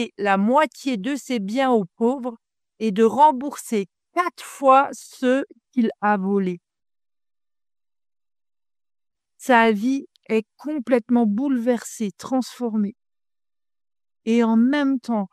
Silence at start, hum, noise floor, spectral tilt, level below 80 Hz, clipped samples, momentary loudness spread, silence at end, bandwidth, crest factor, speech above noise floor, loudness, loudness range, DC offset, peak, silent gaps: 0 s; none; under -90 dBFS; -5.5 dB/octave; -72 dBFS; under 0.1%; 12 LU; 0.05 s; 14.5 kHz; 20 dB; over 70 dB; -21 LUFS; 6 LU; under 0.1%; -2 dBFS; none